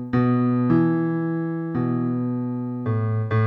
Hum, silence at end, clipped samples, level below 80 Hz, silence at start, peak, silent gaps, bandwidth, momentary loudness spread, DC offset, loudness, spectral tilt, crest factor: none; 0 s; under 0.1%; -56 dBFS; 0 s; -8 dBFS; none; 4.7 kHz; 7 LU; under 0.1%; -23 LUFS; -11.5 dB/octave; 14 dB